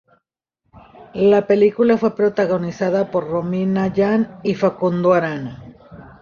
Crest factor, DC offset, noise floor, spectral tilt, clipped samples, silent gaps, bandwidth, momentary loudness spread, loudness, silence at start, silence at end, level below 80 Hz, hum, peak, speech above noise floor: 16 dB; under 0.1%; -74 dBFS; -8 dB/octave; under 0.1%; none; 7 kHz; 8 LU; -18 LUFS; 0.75 s; 0.15 s; -54 dBFS; none; -2 dBFS; 57 dB